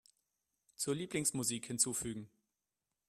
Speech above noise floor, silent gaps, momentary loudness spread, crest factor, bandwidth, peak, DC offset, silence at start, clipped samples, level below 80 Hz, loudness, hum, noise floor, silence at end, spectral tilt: over 52 dB; none; 9 LU; 24 dB; 15.5 kHz; -18 dBFS; under 0.1%; 0.8 s; under 0.1%; -70 dBFS; -36 LUFS; none; under -90 dBFS; 0.8 s; -3 dB/octave